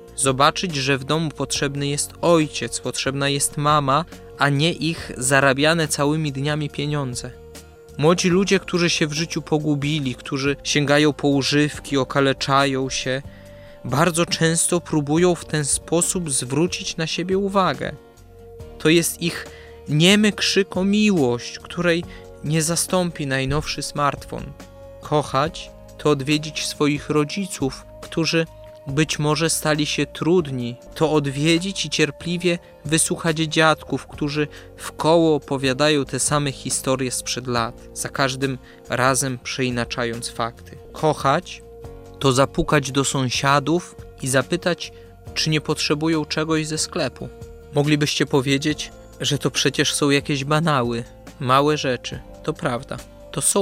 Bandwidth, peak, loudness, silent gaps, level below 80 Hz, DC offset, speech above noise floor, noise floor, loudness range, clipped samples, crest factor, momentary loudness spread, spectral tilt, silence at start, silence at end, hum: 16 kHz; -2 dBFS; -21 LUFS; none; -46 dBFS; under 0.1%; 23 dB; -43 dBFS; 3 LU; under 0.1%; 20 dB; 12 LU; -4 dB/octave; 0 s; 0 s; none